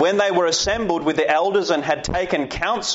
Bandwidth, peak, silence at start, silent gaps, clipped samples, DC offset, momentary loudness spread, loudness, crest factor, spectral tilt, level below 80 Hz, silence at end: 8 kHz; -6 dBFS; 0 s; none; under 0.1%; under 0.1%; 4 LU; -20 LUFS; 14 dB; -2 dB/octave; -42 dBFS; 0 s